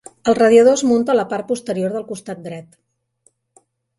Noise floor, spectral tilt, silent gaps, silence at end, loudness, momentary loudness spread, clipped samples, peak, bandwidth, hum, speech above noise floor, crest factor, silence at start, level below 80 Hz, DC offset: -61 dBFS; -5 dB/octave; none; 1.35 s; -16 LUFS; 19 LU; under 0.1%; 0 dBFS; 11.5 kHz; none; 45 dB; 18 dB; 0.25 s; -60 dBFS; under 0.1%